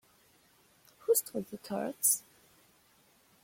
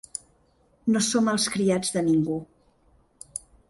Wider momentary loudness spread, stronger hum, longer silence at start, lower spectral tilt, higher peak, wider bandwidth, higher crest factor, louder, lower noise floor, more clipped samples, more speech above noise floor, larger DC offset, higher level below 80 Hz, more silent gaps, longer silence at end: about the same, 13 LU vs 15 LU; neither; first, 1.1 s vs 0.85 s; second, -2.5 dB/octave vs -4 dB/octave; second, -16 dBFS vs -12 dBFS; first, 16.5 kHz vs 11.5 kHz; first, 22 dB vs 16 dB; second, -31 LUFS vs -24 LUFS; about the same, -66 dBFS vs -63 dBFS; neither; second, 33 dB vs 40 dB; neither; second, -78 dBFS vs -62 dBFS; neither; first, 1.25 s vs 0.3 s